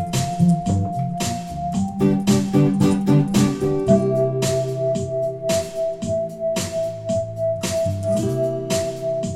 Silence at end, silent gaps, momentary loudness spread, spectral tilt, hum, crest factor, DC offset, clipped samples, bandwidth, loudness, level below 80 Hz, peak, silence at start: 0 s; none; 7 LU; -6.5 dB/octave; none; 16 dB; under 0.1%; under 0.1%; 16 kHz; -21 LUFS; -46 dBFS; -4 dBFS; 0 s